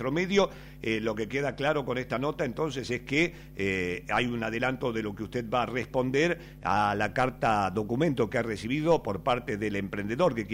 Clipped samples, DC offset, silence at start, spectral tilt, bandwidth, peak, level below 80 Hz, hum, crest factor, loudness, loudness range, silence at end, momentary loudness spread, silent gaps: under 0.1%; under 0.1%; 0 s; -6 dB/octave; 16 kHz; -12 dBFS; -52 dBFS; none; 18 dB; -29 LUFS; 2 LU; 0 s; 6 LU; none